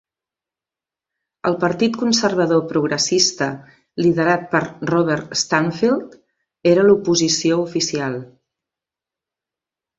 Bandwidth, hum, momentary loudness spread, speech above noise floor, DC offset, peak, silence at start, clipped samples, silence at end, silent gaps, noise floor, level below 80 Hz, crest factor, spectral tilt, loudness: 8 kHz; none; 9 LU; 71 dB; under 0.1%; -2 dBFS; 1.45 s; under 0.1%; 1.75 s; none; -89 dBFS; -58 dBFS; 18 dB; -4 dB/octave; -18 LUFS